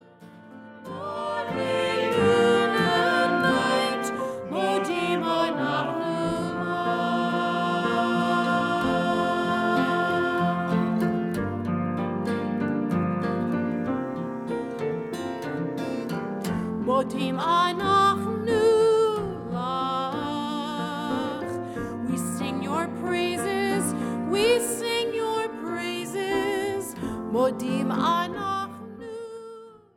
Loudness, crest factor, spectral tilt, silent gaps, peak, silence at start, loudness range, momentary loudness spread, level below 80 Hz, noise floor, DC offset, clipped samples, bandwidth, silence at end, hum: -25 LUFS; 16 dB; -5 dB/octave; none; -10 dBFS; 0.2 s; 6 LU; 10 LU; -58 dBFS; -48 dBFS; under 0.1%; under 0.1%; 17.5 kHz; 0.2 s; none